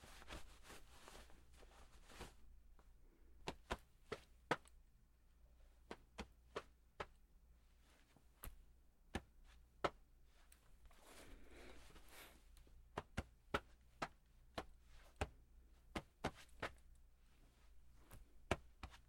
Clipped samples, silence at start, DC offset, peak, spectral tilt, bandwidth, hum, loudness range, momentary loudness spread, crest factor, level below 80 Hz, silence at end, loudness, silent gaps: under 0.1%; 0 s; under 0.1%; -20 dBFS; -4.5 dB/octave; 16.5 kHz; none; 7 LU; 19 LU; 34 dB; -64 dBFS; 0 s; -53 LUFS; none